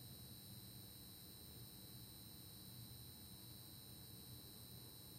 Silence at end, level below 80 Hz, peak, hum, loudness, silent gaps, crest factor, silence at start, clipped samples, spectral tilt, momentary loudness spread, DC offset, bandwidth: 0 s; -74 dBFS; -44 dBFS; none; -56 LUFS; none; 14 dB; 0 s; under 0.1%; -3.5 dB/octave; 1 LU; under 0.1%; 16 kHz